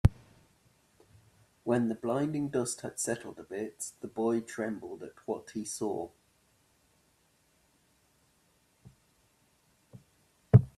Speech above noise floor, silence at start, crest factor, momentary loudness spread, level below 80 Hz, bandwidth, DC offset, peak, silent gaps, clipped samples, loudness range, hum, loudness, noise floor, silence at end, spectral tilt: 36 dB; 0.05 s; 28 dB; 12 LU; -50 dBFS; 13.5 kHz; under 0.1%; -6 dBFS; none; under 0.1%; 9 LU; none; -33 LUFS; -70 dBFS; 0.1 s; -6.5 dB/octave